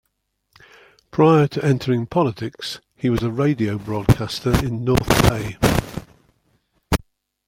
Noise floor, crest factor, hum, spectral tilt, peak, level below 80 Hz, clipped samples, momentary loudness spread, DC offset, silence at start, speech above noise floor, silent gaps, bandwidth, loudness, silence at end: -72 dBFS; 20 dB; none; -6 dB/octave; 0 dBFS; -36 dBFS; under 0.1%; 13 LU; under 0.1%; 1.15 s; 53 dB; none; 16.5 kHz; -20 LUFS; 0.5 s